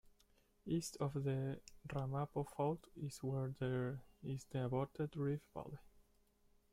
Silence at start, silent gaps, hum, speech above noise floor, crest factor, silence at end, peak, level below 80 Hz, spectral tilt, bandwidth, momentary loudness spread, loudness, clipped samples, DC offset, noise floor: 0.05 s; none; none; 32 dB; 16 dB; 0.85 s; -28 dBFS; -68 dBFS; -7 dB/octave; 15.5 kHz; 10 LU; -43 LUFS; under 0.1%; under 0.1%; -74 dBFS